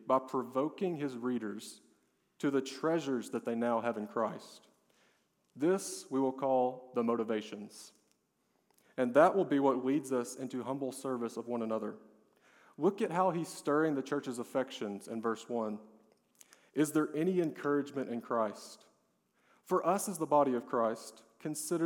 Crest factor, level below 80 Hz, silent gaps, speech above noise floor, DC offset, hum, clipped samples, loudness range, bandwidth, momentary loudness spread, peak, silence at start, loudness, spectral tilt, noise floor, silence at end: 22 dB; under -90 dBFS; none; 44 dB; under 0.1%; none; under 0.1%; 4 LU; 18 kHz; 12 LU; -12 dBFS; 0 s; -34 LUFS; -5.5 dB/octave; -77 dBFS; 0 s